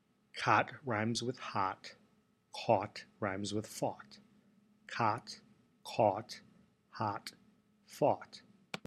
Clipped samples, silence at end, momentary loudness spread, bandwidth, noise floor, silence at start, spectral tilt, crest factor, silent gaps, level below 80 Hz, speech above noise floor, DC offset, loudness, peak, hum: under 0.1%; 0.1 s; 21 LU; 14.5 kHz; -72 dBFS; 0.35 s; -5 dB/octave; 24 dB; none; -78 dBFS; 36 dB; under 0.1%; -36 LUFS; -14 dBFS; none